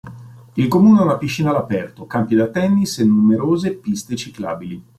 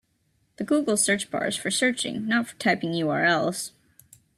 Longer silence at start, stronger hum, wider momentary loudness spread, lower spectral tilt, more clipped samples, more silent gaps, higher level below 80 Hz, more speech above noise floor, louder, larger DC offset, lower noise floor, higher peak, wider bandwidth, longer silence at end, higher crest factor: second, 0.05 s vs 0.6 s; neither; first, 14 LU vs 7 LU; first, -6.5 dB/octave vs -3 dB/octave; neither; neither; first, -54 dBFS vs -68 dBFS; second, 21 dB vs 44 dB; first, -17 LUFS vs -24 LUFS; neither; second, -38 dBFS vs -69 dBFS; first, -2 dBFS vs -8 dBFS; about the same, 13.5 kHz vs 14.5 kHz; second, 0.15 s vs 0.7 s; about the same, 14 dB vs 18 dB